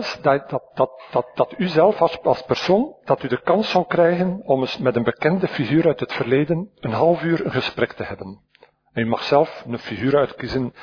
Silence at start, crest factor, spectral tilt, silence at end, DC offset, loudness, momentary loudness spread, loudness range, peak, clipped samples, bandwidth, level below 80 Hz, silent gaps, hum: 0 s; 18 dB; -7 dB/octave; 0 s; under 0.1%; -20 LUFS; 8 LU; 3 LU; -2 dBFS; under 0.1%; 5.4 kHz; -54 dBFS; none; none